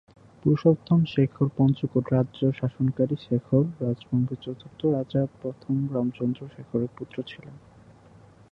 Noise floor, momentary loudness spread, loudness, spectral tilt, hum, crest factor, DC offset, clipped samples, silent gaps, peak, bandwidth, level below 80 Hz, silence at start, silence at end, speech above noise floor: -52 dBFS; 14 LU; -26 LUFS; -10.5 dB/octave; none; 20 dB; under 0.1%; under 0.1%; none; -6 dBFS; 6 kHz; -58 dBFS; 0.45 s; 0.95 s; 27 dB